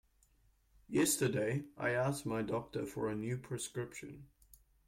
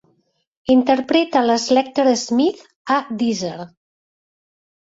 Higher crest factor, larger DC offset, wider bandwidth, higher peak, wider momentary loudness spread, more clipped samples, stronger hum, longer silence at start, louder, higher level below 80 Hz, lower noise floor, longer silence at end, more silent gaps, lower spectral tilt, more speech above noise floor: about the same, 16 dB vs 18 dB; neither; first, 16.5 kHz vs 8 kHz; second, -22 dBFS vs -2 dBFS; about the same, 13 LU vs 14 LU; neither; neither; first, 0.9 s vs 0.7 s; second, -37 LUFS vs -18 LUFS; second, -66 dBFS vs -60 dBFS; first, -71 dBFS vs -64 dBFS; second, 0.6 s vs 1.2 s; second, none vs 2.76-2.85 s; about the same, -4.5 dB/octave vs -4 dB/octave; second, 34 dB vs 47 dB